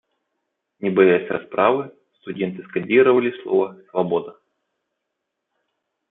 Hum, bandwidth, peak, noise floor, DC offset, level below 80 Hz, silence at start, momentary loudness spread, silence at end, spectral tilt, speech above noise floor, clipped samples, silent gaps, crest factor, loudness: none; 3.9 kHz; -2 dBFS; -79 dBFS; under 0.1%; -70 dBFS; 0.8 s; 12 LU; 1.8 s; -10.5 dB/octave; 60 dB; under 0.1%; none; 20 dB; -20 LUFS